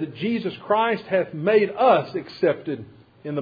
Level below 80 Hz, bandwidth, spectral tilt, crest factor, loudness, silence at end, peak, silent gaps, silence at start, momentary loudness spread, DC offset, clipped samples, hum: -66 dBFS; 5 kHz; -8.5 dB/octave; 16 dB; -22 LUFS; 0 s; -6 dBFS; none; 0 s; 13 LU; under 0.1%; under 0.1%; none